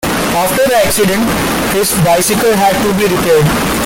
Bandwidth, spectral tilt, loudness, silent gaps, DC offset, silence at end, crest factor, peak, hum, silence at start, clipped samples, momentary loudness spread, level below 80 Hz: 17 kHz; -4 dB/octave; -11 LUFS; none; under 0.1%; 0 s; 10 dB; -2 dBFS; none; 0 s; under 0.1%; 3 LU; -32 dBFS